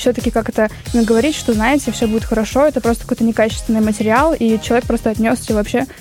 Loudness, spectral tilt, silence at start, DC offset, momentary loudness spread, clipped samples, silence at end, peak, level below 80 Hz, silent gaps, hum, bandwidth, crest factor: -16 LUFS; -5 dB/octave; 0 s; under 0.1%; 5 LU; under 0.1%; 0 s; -2 dBFS; -32 dBFS; none; none; 16.5 kHz; 14 dB